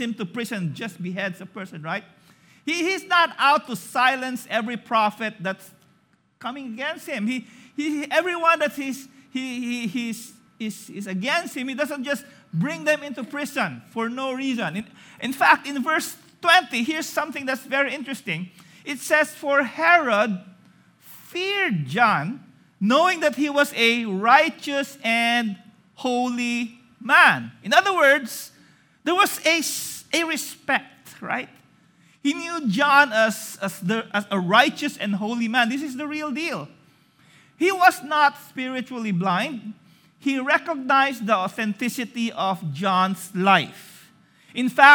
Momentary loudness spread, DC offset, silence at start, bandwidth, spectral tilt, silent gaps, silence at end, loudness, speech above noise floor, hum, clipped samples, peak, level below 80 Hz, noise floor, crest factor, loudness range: 15 LU; under 0.1%; 0 s; over 20 kHz; -4 dB/octave; none; 0 s; -22 LUFS; 40 dB; none; under 0.1%; 0 dBFS; -78 dBFS; -62 dBFS; 22 dB; 7 LU